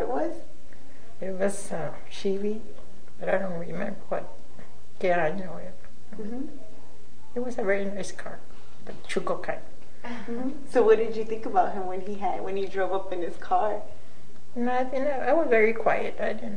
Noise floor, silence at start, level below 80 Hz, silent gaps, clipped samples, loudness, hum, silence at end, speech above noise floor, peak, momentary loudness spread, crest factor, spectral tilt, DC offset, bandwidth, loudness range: -53 dBFS; 0 s; -58 dBFS; none; under 0.1%; -28 LUFS; none; 0 s; 25 dB; -8 dBFS; 18 LU; 22 dB; -5.5 dB/octave; 6%; 10 kHz; 7 LU